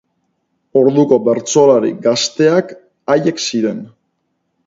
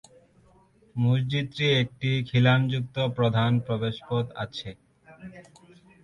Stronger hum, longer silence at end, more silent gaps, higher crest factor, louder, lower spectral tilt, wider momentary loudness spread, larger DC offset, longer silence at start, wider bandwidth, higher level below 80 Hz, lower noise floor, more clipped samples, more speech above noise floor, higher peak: neither; first, 0.8 s vs 0.65 s; neither; about the same, 14 dB vs 18 dB; first, -14 LUFS vs -25 LUFS; second, -4.5 dB/octave vs -7 dB/octave; second, 9 LU vs 19 LU; neither; second, 0.75 s vs 0.95 s; first, 7.8 kHz vs 7 kHz; about the same, -62 dBFS vs -58 dBFS; first, -68 dBFS vs -59 dBFS; neither; first, 55 dB vs 34 dB; first, 0 dBFS vs -10 dBFS